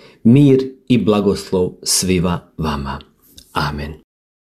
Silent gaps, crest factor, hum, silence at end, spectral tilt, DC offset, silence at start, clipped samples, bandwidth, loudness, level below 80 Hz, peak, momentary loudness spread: none; 16 dB; none; 0.45 s; -5.5 dB/octave; under 0.1%; 0.25 s; under 0.1%; 14.5 kHz; -16 LUFS; -38 dBFS; -2 dBFS; 16 LU